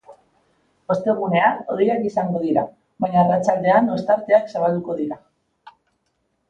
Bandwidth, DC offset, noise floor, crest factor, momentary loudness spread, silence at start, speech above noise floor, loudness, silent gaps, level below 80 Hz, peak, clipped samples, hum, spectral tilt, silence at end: 8.6 kHz; under 0.1%; -70 dBFS; 18 dB; 10 LU; 0.1 s; 51 dB; -20 LUFS; none; -62 dBFS; -2 dBFS; under 0.1%; none; -7.5 dB/octave; 1.3 s